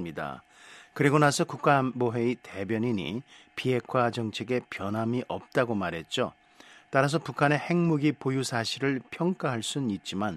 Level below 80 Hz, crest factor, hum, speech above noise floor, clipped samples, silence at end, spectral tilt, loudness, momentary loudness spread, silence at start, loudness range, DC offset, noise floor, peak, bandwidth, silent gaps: -66 dBFS; 22 dB; none; 27 dB; under 0.1%; 0 s; -5.5 dB/octave; -28 LUFS; 10 LU; 0 s; 3 LU; under 0.1%; -55 dBFS; -6 dBFS; 13.5 kHz; none